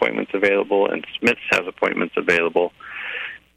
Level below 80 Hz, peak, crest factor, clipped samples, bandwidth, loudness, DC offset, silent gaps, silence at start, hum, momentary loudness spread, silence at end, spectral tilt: -60 dBFS; -4 dBFS; 18 dB; under 0.1%; 14 kHz; -20 LUFS; under 0.1%; none; 0 s; none; 10 LU; 0.2 s; -4.5 dB/octave